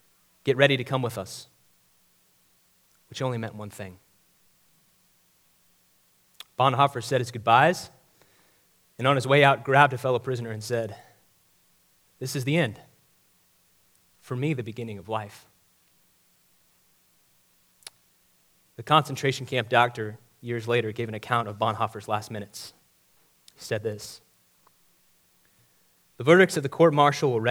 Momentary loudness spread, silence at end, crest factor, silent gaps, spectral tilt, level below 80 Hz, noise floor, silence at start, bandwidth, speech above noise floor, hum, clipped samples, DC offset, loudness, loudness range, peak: 22 LU; 0 s; 26 dB; none; -5.5 dB/octave; -72 dBFS; -64 dBFS; 0.45 s; over 20 kHz; 40 dB; none; under 0.1%; under 0.1%; -24 LUFS; 15 LU; -2 dBFS